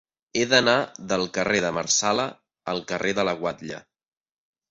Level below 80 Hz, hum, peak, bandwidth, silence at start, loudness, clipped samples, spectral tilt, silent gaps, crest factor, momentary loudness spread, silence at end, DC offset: -60 dBFS; none; -4 dBFS; 8.4 kHz; 0.35 s; -23 LUFS; under 0.1%; -2.5 dB/octave; none; 22 dB; 14 LU; 0.9 s; under 0.1%